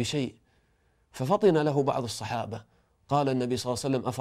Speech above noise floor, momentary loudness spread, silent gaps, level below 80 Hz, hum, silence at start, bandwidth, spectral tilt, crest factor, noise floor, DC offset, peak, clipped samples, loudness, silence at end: 41 dB; 13 LU; none; -62 dBFS; none; 0 s; 15 kHz; -6 dB/octave; 18 dB; -68 dBFS; under 0.1%; -10 dBFS; under 0.1%; -28 LUFS; 0 s